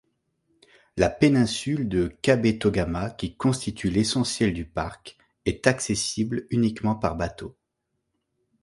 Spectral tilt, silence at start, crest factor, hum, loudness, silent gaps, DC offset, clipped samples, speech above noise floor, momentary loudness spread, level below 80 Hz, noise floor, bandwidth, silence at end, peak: -5 dB/octave; 0.95 s; 22 dB; none; -25 LUFS; none; under 0.1%; under 0.1%; 55 dB; 11 LU; -44 dBFS; -79 dBFS; 11.5 kHz; 1.1 s; -4 dBFS